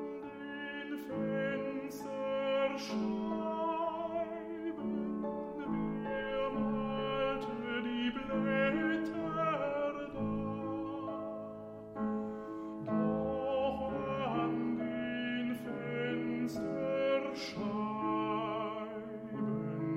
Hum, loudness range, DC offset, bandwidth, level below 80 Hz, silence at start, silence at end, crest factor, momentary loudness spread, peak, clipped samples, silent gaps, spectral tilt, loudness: none; 3 LU; under 0.1%; 15 kHz; -62 dBFS; 0 s; 0 s; 16 dB; 8 LU; -20 dBFS; under 0.1%; none; -6.5 dB/octave; -36 LUFS